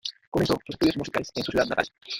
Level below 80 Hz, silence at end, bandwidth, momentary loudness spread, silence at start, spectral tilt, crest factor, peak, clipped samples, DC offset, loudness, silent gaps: -50 dBFS; 0 s; 17 kHz; 5 LU; 0.05 s; -5 dB/octave; 20 dB; -6 dBFS; under 0.1%; under 0.1%; -26 LUFS; 0.27-0.32 s